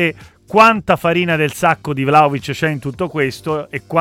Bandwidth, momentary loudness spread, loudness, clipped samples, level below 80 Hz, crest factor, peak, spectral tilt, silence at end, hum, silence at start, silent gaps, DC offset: 17 kHz; 11 LU; -15 LUFS; under 0.1%; -48 dBFS; 16 dB; 0 dBFS; -5.5 dB/octave; 0 s; none; 0 s; none; under 0.1%